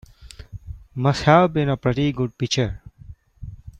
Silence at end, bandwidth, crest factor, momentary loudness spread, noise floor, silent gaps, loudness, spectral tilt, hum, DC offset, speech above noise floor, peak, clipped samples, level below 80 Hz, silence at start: 0.1 s; 9.4 kHz; 20 dB; 24 LU; -44 dBFS; none; -20 LUFS; -6 dB/octave; none; under 0.1%; 25 dB; -2 dBFS; under 0.1%; -42 dBFS; 0.2 s